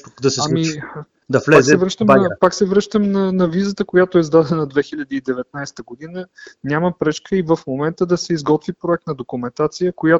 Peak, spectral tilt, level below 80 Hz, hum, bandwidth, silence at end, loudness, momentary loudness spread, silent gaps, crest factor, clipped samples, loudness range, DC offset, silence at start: 0 dBFS; -5.5 dB/octave; -52 dBFS; none; 8 kHz; 0 s; -17 LUFS; 17 LU; none; 16 dB; under 0.1%; 7 LU; under 0.1%; 0.2 s